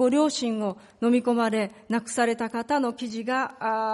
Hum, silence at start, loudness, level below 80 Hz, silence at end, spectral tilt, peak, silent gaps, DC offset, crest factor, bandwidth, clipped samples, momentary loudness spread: none; 0 s; -26 LUFS; -70 dBFS; 0 s; -4 dB/octave; -10 dBFS; none; under 0.1%; 14 dB; 11.5 kHz; under 0.1%; 7 LU